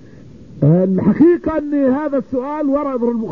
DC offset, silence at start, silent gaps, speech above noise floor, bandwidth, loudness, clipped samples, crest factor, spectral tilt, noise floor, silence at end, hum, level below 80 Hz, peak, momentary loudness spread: 0.5%; 0.25 s; none; 25 dB; 5.2 kHz; -16 LUFS; under 0.1%; 14 dB; -11.5 dB/octave; -39 dBFS; 0 s; none; -44 dBFS; -2 dBFS; 7 LU